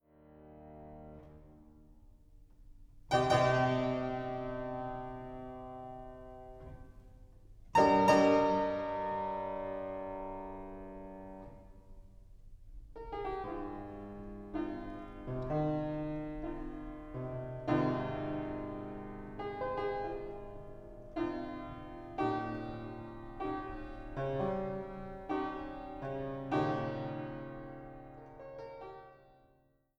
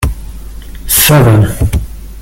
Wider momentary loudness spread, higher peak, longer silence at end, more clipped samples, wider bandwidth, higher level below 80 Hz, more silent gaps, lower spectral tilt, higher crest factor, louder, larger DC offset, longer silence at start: about the same, 22 LU vs 24 LU; second, -12 dBFS vs 0 dBFS; first, 0.75 s vs 0 s; second, under 0.1% vs 0.1%; second, 12.5 kHz vs over 20 kHz; second, -54 dBFS vs -20 dBFS; neither; first, -6.5 dB/octave vs -4.5 dB/octave; first, 26 dB vs 10 dB; second, -36 LUFS vs -9 LUFS; neither; first, 0.2 s vs 0 s